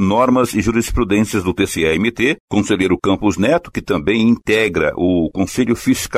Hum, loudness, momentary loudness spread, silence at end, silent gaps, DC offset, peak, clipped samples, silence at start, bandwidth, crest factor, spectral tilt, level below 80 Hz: none; -16 LUFS; 4 LU; 0 s; 2.40-2.48 s; under 0.1%; -4 dBFS; under 0.1%; 0 s; 15.5 kHz; 12 dB; -5 dB/octave; -34 dBFS